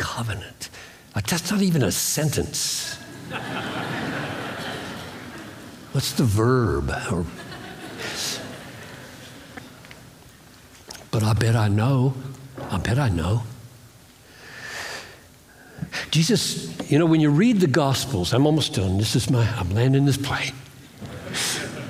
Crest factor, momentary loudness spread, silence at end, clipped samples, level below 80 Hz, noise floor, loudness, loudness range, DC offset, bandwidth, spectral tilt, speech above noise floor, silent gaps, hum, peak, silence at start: 20 dB; 21 LU; 0 s; under 0.1%; -48 dBFS; -49 dBFS; -23 LUFS; 11 LU; under 0.1%; 16.5 kHz; -5 dB/octave; 28 dB; none; none; -4 dBFS; 0 s